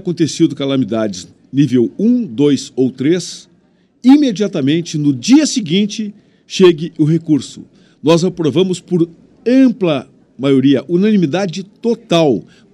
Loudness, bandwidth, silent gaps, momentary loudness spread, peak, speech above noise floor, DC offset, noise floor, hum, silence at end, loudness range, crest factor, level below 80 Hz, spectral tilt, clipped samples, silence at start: -14 LUFS; 11 kHz; none; 10 LU; 0 dBFS; 40 dB; under 0.1%; -53 dBFS; none; 0.35 s; 2 LU; 14 dB; -60 dBFS; -6 dB/octave; under 0.1%; 0.05 s